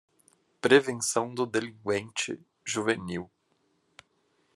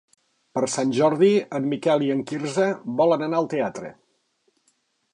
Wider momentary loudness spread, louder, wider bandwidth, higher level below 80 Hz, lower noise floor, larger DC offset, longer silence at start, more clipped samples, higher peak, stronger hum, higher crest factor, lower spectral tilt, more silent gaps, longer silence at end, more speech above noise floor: first, 15 LU vs 9 LU; second, -28 LUFS vs -22 LUFS; first, 13 kHz vs 11 kHz; about the same, -76 dBFS vs -72 dBFS; about the same, -72 dBFS vs -69 dBFS; neither; about the same, 0.65 s vs 0.55 s; neither; about the same, -4 dBFS vs -6 dBFS; neither; first, 26 dB vs 16 dB; second, -3.5 dB/octave vs -5.5 dB/octave; neither; about the same, 1.3 s vs 1.2 s; about the same, 44 dB vs 47 dB